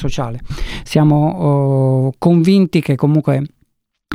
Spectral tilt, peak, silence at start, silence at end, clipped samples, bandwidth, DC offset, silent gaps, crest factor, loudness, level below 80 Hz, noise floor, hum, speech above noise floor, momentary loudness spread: -8 dB/octave; -2 dBFS; 0 s; 0 s; under 0.1%; 14.5 kHz; under 0.1%; none; 14 dB; -14 LUFS; -32 dBFS; -62 dBFS; none; 49 dB; 14 LU